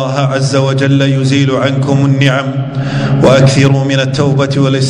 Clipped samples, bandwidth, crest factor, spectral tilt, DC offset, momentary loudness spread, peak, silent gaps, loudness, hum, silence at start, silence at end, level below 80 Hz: 0.8%; 10.5 kHz; 10 dB; -6.5 dB/octave; under 0.1%; 7 LU; 0 dBFS; none; -10 LUFS; none; 0 s; 0 s; -40 dBFS